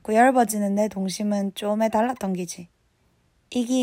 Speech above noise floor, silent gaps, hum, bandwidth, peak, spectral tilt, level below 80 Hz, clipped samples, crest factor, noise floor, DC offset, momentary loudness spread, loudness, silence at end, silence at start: 43 dB; none; none; 16 kHz; -6 dBFS; -5 dB/octave; -64 dBFS; under 0.1%; 18 dB; -65 dBFS; under 0.1%; 12 LU; -23 LUFS; 0 s; 0.05 s